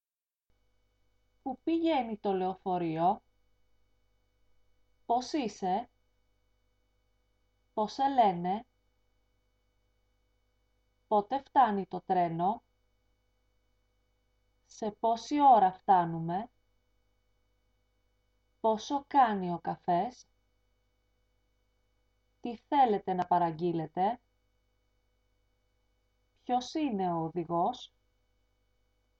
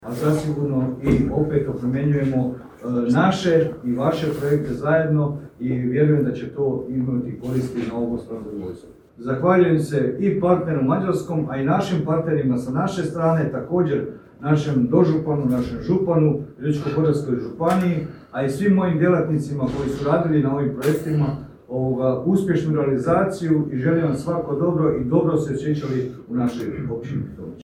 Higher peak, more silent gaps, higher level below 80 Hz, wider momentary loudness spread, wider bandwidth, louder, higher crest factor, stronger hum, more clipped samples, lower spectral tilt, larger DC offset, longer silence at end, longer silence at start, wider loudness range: second, -12 dBFS vs -2 dBFS; neither; second, -70 dBFS vs -48 dBFS; first, 13 LU vs 8 LU; second, 7.8 kHz vs 19 kHz; second, -30 LUFS vs -21 LUFS; about the same, 20 dB vs 18 dB; first, 50 Hz at -65 dBFS vs none; neither; second, -6.5 dB/octave vs -8 dB/octave; neither; first, 1.35 s vs 0 s; first, 1.45 s vs 0 s; first, 8 LU vs 2 LU